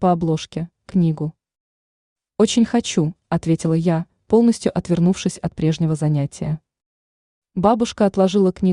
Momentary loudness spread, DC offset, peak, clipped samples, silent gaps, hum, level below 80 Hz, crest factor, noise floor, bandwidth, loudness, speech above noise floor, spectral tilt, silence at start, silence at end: 10 LU; under 0.1%; -2 dBFS; under 0.1%; 1.60-2.16 s, 6.86-7.42 s; none; -50 dBFS; 16 dB; under -90 dBFS; 11 kHz; -19 LUFS; over 72 dB; -6.5 dB/octave; 0 s; 0 s